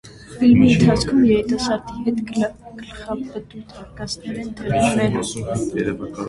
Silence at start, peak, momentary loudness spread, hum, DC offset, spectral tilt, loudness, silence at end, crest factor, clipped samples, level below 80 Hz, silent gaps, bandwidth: 0.05 s; -2 dBFS; 21 LU; none; under 0.1%; -6 dB/octave; -19 LUFS; 0 s; 18 dB; under 0.1%; -42 dBFS; none; 11.5 kHz